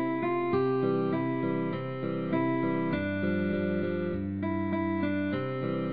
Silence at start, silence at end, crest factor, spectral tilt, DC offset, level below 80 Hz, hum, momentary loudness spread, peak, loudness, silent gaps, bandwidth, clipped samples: 0 s; 0 s; 12 dB; -11 dB/octave; 0.3%; -62 dBFS; none; 4 LU; -16 dBFS; -30 LUFS; none; 5 kHz; under 0.1%